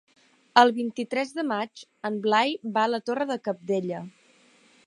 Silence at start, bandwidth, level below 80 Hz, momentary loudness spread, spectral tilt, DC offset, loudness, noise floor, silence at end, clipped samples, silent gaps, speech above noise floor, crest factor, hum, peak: 0.55 s; 11.5 kHz; -80 dBFS; 15 LU; -4.5 dB/octave; under 0.1%; -26 LUFS; -59 dBFS; 0.75 s; under 0.1%; none; 34 dB; 24 dB; none; -2 dBFS